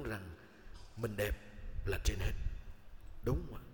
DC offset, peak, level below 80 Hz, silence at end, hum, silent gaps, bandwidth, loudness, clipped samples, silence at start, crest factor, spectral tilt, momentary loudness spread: under 0.1%; -20 dBFS; -42 dBFS; 0 s; none; none; 19 kHz; -41 LUFS; under 0.1%; 0 s; 20 dB; -5.5 dB/octave; 20 LU